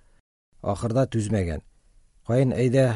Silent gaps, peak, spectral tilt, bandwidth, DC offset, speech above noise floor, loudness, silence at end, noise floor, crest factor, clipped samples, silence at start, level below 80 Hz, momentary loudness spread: none; -8 dBFS; -7.5 dB/octave; 11.5 kHz; under 0.1%; 35 dB; -25 LUFS; 0 s; -57 dBFS; 16 dB; under 0.1%; 0.65 s; -46 dBFS; 13 LU